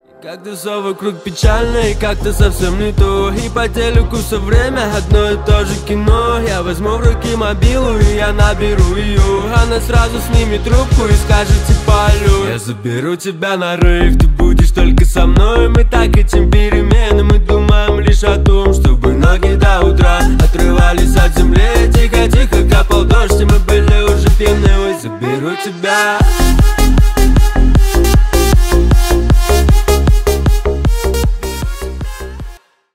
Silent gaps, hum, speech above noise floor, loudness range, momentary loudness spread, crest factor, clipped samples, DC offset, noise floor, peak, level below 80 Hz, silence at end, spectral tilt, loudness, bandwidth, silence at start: none; none; 22 dB; 3 LU; 7 LU; 10 dB; under 0.1%; under 0.1%; -32 dBFS; 0 dBFS; -12 dBFS; 0.4 s; -6 dB/octave; -12 LUFS; 16 kHz; 0.25 s